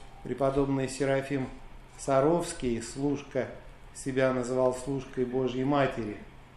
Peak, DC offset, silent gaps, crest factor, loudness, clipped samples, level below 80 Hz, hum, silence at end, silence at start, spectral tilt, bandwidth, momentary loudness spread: -12 dBFS; under 0.1%; none; 18 dB; -30 LUFS; under 0.1%; -50 dBFS; none; 0.1 s; 0 s; -6 dB/octave; 12.5 kHz; 12 LU